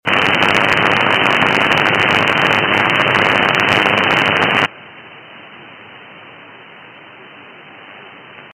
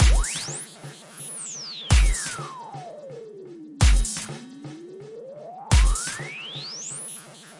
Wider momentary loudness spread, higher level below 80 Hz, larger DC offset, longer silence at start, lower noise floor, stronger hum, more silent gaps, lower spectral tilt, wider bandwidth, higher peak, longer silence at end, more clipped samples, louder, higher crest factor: second, 1 LU vs 20 LU; second, -54 dBFS vs -26 dBFS; neither; about the same, 0.05 s vs 0 s; second, -38 dBFS vs -43 dBFS; neither; neither; about the same, -4 dB/octave vs -3.5 dB/octave; first, over 20 kHz vs 11.5 kHz; first, 0 dBFS vs -6 dBFS; about the same, 0.05 s vs 0.05 s; neither; first, -12 LUFS vs -26 LUFS; about the same, 16 dB vs 18 dB